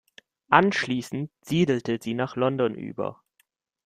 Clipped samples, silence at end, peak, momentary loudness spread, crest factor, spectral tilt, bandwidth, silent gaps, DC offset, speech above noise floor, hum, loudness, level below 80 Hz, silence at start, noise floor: under 0.1%; 0.7 s; -2 dBFS; 13 LU; 24 dB; -6 dB/octave; 15 kHz; none; under 0.1%; 45 dB; none; -25 LUFS; -64 dBFS; 0.5 s; -70 dBFS